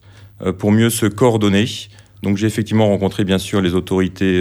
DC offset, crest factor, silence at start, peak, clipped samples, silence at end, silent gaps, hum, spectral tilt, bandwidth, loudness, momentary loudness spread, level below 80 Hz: under 0.1%; 16 dB; 0.2 s; 0 dBFS; under 0.1%; 0 s; none; none; -6 dB/octave; 19.5 kHz; -17 LUFS; 10 LU; -46 dBFS